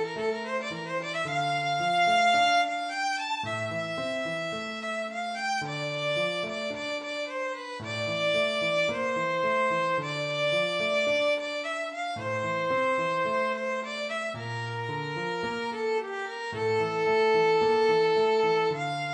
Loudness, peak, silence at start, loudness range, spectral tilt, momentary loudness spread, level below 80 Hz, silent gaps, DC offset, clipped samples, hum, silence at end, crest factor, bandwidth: -28 LUFS; -14 dBFS; 0 s; 5 LU; -4 dB/octave; 9 LU; -70 dBFS; none; under 0.1%; under 0.1%; none; 0 s; 14 dB; 10.5 kHz